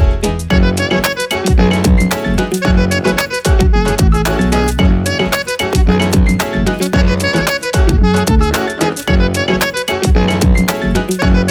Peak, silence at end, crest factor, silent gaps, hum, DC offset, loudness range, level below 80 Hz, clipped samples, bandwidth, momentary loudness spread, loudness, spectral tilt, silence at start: 0 dBFS; 0 s; 12 dB; none; none; under 0.1%; 1 LU; -16 dBFS; under 0.1%; over 20 kHz; 4 LU; -13 LUFS; -5.5 dB/octave; 0 s